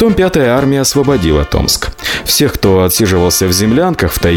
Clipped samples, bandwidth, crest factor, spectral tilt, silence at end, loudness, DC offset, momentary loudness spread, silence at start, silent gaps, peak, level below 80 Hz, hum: under 0.1%; 19 kHz; 10 dB; -4.5 dB/octave; 0 s; -11 LUFS; under 0.1%; 3 LU; 0 s; none; 0 dBFS; -26 dBFS; none